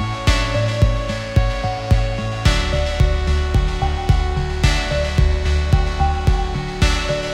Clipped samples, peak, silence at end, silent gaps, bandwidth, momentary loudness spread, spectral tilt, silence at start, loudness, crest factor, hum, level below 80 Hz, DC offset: under 0.1%; -2 dBFS; 0 s; none; 12.5 kHz; 4 LU; -5.5 dB/octave; 0 s; -19 LUFS; 16 dB; none; -20 dBFS; under 0.1%